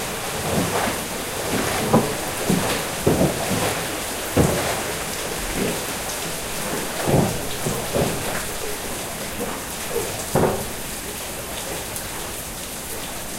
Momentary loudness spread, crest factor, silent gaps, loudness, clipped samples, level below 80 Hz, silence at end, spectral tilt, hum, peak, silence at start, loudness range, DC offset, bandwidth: 8 LU; 22 dB; none; -23 LUFS; under 0.1%; -40 dBFS; 0 s; -3.5 dB/octave; none; -2 dBFS; 0 s; 4 LU; under 0.1%; 16 kHz